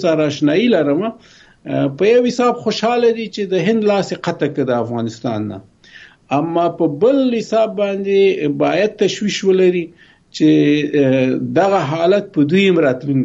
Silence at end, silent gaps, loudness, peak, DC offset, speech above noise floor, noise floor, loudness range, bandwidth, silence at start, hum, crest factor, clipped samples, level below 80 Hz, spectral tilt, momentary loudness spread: 0 s; none; -16 LUFS; -2 dBFS; under 0.1%; 28 dB; -43 dBFS; 4 LU; 8 kHz; 0 s; none; 14 dB; under 0.1%; -58 dBFS; -6 dB/octave; 9 LU